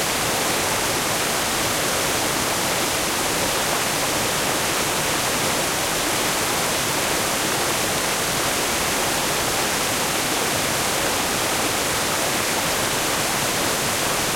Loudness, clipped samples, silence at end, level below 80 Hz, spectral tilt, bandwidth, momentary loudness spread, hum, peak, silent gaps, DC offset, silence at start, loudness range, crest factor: -20 LUFS; under 0.1%; 0 s; -46 dBFS; -1.5 dB/octave; 16.5 kHz; 0 LU; none; -8 dBFS; none; under 0.1%; 0 s; 0 LU; 14 dB